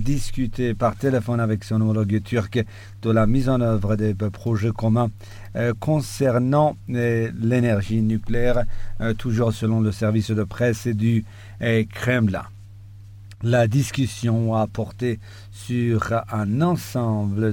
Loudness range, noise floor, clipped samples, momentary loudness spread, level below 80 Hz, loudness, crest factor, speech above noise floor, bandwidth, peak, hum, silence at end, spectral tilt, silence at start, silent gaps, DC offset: 2 LU; -41 dBFS; under 0.1%; 7 LU; -38 dBFS; -22 LUFS; 14 dB; 20 dB; 16.5 kHz; -6 dBFS; none; 0 s; -7.5 dB/octave; 0 s; none; under 0.1%